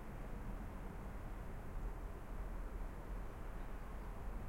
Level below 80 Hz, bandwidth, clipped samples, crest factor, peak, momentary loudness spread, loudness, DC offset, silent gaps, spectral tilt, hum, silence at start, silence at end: -48 dBFS; 16.5 kHz; under 0.1%; 12 dB; -34 dBFS; 2 LU; -51 LUFS; under 0.1%; none; -7 dB/octave; none; 0 s; 0 s